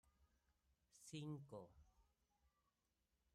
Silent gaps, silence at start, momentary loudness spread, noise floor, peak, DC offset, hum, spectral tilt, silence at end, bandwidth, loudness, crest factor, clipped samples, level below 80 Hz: none; 0.05 s; 13 LU; -89 dBFS; -40 dBFS; under 0.1%; none; -5.5 dB/octave; 0.85 s; 13.5 kHz; -56 LUFS; 20 dB; under 0.1%; -82 dBFS